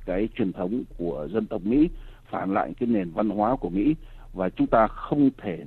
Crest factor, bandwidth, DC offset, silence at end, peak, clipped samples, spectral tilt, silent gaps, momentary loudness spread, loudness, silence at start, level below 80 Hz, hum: 18 dB; 4.3 kHz; under 0.1%; 0 s; -6 dBFS; under 0.1%; -10 dB/octave; none; 9 LU; -26 LUFS; 0 s; -42 dBFS; none